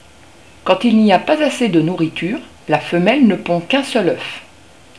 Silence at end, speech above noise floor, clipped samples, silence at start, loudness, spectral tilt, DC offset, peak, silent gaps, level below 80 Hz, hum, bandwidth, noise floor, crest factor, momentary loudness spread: 0.55 s; 30 dB; under 0.1%; 0.65 s; -15 LUFS; -6 dB/octave; 0.4%; 0 dBFS; none; -54 dBFS; none; 11 kHz; -44 dBFS; 16 dB; 12 LU